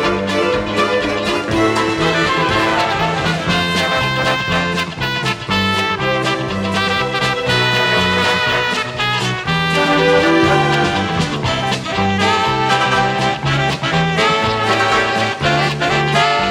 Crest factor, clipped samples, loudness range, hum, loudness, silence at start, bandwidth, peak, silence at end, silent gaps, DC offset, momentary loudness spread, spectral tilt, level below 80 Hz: 14 dB; under 0.1%; 2 LU; none; -15 LUFS; 0 s; 17 kHz; 0 dBFS; 0 s; none; under 0.1%; 5 LU; -4.5 dB/octave; -40 dBFS